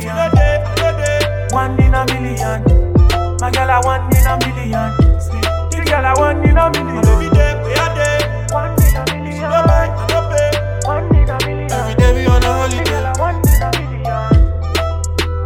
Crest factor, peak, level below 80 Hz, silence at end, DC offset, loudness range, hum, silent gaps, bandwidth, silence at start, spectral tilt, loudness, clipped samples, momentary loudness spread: 12 dB; 0 dBFS; -18 dBFS; 0 s; under 0.1%; 1 LU; none; none; 16.5 kHz; 0 s; -5.5 dB/octave; -14 LUFS; under 0.1%; 6 LU